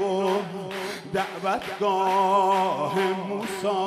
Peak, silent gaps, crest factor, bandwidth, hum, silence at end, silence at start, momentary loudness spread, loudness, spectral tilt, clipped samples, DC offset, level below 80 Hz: -10 dBFS; none; 14 dB; 14.5 kHz; none; 0 s; 0 s; 10 LU; -25 LUFS; -5 dB/octave; under 0.1%; under 0.1%; -66 dBFS